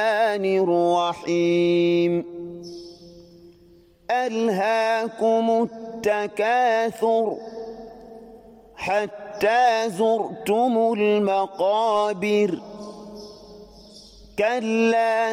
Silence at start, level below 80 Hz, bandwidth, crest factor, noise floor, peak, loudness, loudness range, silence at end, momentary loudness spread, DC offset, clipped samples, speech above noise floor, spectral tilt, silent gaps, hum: 0 s; -62 dBFS; 16 kHz; 14 dB; -53 dBFS; -8 dBFS; -22 LUFS; 4 LU; 0 s; 19 LU; under 0.1%; under 0.1%; 32 dB; -5.5 dB/octave; none; none